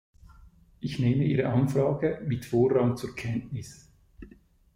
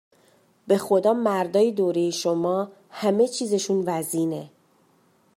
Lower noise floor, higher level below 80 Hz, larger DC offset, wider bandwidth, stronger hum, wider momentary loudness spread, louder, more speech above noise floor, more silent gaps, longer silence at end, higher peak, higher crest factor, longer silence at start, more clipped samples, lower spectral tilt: second, -56 dBFS vs -62 dBFS; first, -54 dBFS vs -76 dBFS; neither; about the same, 16 kHz vs 16 kHz; neither; first, 14 LU vs 7 LU; second, -27 LUFS vs -23 LUFS; second, 30 dB vs 39 dB; neither; second, 0.5 s vs 0.9 s; second, -12 dBFS vs -8 dBFS; about the same, 18 dB vs 16 dB; first, 0.8 s vs 0.65 s; neither; first, -8 dB/octave vs -5 dB/octave